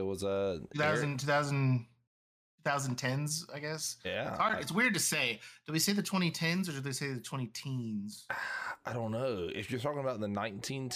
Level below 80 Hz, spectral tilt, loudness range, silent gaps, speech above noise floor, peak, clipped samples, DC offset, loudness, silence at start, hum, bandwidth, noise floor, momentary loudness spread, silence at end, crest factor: -72 dBFS; -4 dB/octave; 5 LU; 2.07-2.58 s; over 56 dB; -18 dBFS; under 0.1%; under 0.1%; -34 LUFS; 0 s; none; 15.5 kHz; under -90 dBFS; 9 LU; 0 s; 18 dB